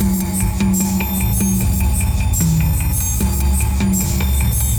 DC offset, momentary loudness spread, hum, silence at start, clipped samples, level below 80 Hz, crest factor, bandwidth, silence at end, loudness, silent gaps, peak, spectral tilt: under 0.1%; 2 LU; none; 0 s; under 0.1%; -20 dBFS; 10 dB; over 20 kHz; 0 s; -17 LUFS; none; -6 dBFS; -5 dB/octave